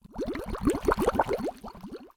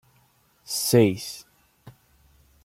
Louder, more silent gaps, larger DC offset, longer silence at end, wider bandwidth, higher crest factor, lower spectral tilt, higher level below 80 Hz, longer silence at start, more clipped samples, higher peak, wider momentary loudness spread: second, -29 LUFS vs -22 LUFS; neither; neither; second, 0.1 s vs 0.75 s; about the same, 18 kHz vs 16.5 kHz; about the same, 22 dB vs 22 dB; about the same, -6 dB/octave vs -5 dB/octave; first, -42 dBFS vs -62 dBFS; second, 0.05 s vs 0.7 s; neither; about the same, -8 dBFS vs -6 dBFS; about the same, 17 LU vs 18 LU